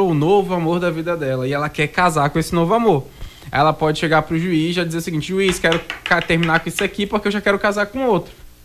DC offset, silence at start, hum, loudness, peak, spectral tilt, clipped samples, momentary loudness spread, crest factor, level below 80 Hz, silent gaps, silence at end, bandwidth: under 0.1%; 0 s; none; -18 LUFS; -4 dBFS; -5.5 dB/octave; under 0.1%; 6 LU; 14 dB; -42 dBFS; none; 0.15 s; 15.5 kHz